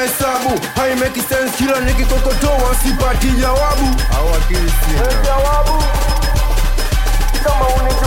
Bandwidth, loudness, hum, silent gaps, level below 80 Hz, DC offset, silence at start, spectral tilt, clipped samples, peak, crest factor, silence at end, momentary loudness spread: 17 kHz; -16 LUFS; none; none; -14 dBFS; under 0.1%; 0 s; -4.5 dB/octave; under 0.1%; -4 dBFS; 10 dB; 0 s; 2 LU